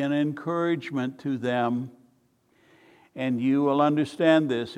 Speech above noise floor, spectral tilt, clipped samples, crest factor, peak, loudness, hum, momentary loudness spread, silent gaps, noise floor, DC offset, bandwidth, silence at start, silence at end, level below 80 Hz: 41 dB; -7 dB/octave; under 0.1%; 20 dB; -6 dBFS; -25 LUFS; none; 10 LU; none; -65 dBFS; under 0.1%; 10.5 kHz; 0 s; 0 s; -74 dBFS